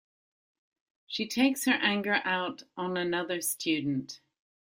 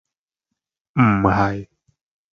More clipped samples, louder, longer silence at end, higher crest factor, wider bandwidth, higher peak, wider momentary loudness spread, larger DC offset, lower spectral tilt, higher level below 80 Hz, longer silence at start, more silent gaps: neither; second, -29 LUFS vs -18 LUFS; second, 0.55 s vs 0.7 s; about the same, 20 dB vs 22 dB; first, 16.5 kHz vs 7 kHz; second, -10 dBFS vs 0 dBFS; about the same, 11 LU vs 12 LU; neither; second, -3.5 dB/octave vs -9 dB/octave; second, -74 dBFS vs -42 dBFS; first, 1.1 s vs 0.95 s; neither